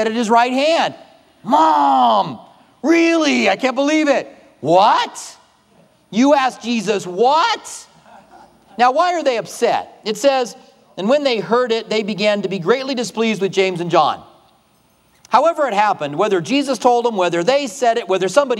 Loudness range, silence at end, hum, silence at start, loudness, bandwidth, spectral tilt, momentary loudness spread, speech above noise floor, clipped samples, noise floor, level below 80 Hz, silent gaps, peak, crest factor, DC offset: 3 LU; 0 s; none; 0 s; -16 LUFS; 14 kHz; -4 dB/octave; 11 LU; 40 dB; under 0.1%; -56 dBFS; -70 dBFS; none; 0 dBFS; 16 dB; under 0.1%